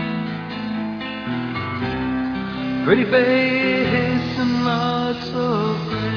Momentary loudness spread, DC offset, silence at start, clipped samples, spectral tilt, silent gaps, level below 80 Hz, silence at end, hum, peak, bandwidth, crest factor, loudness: 10 LU; under 0.1%; 0 s; under 0.1%; -7 dB/octave; none; -46 dBFS; 0 s; none; -2 dBFS; 5.4 kHz; 18 dB; -21 LUFS